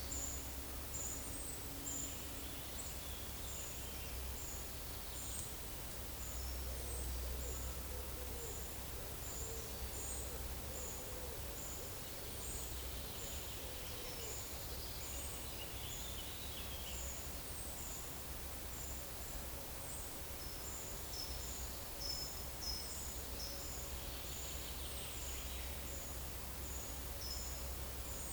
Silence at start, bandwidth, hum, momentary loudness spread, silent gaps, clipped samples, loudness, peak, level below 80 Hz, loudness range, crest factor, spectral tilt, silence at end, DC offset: 0 s; over 20 kHz; none; 3 LU; none; under 0.1%; -44 LUFS; -24 dBFS; -50 dBFS; 1 LU; 22 dB; -2.5 dB/octave; 0 s; under 0.1%